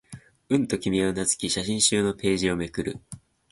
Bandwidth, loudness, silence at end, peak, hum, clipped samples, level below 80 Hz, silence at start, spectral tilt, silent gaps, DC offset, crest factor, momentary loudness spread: 11.5 kHz; -25 LUFS; 0.35 s; -8 dBFS; none; under 0.1%; -50 dBFS; 0.1 s; -3.5 dB/octave; none; under 0.1%; 18 dB; 14 LU